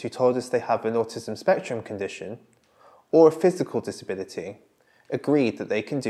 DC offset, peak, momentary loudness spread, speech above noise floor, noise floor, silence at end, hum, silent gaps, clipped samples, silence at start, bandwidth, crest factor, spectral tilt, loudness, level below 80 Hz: under 0.1%; -4 dBFS; 17 LU; 32 dB; -56 dBFS; 0 s; none; none; under 0.1%; 0 s; 12.5 kHz; 20 dB; -6 dB/octave; -24 LUFS; -76 dBFS